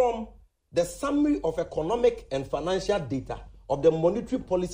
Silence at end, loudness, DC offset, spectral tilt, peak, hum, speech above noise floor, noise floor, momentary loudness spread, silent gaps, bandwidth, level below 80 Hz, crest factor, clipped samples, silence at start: 0 s; -27 LUFS; under 0.1%; -6 dB/octave; -10 dBFS; none; 22 dB; -48 dBFS; 9 LU; none; 16 kHz; -48 dBFS; 18 dB; under 0.1%; 0 s